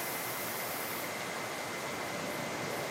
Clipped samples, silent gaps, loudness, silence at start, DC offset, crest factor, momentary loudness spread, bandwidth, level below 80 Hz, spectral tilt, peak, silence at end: under 0.1%; none; -36 LUFS; 0 s; under 0.1%; 14 dB; 2 LU; 16 kHz; -70 dBFS; -2.5 dB/octave; -24 dBFS; 0 s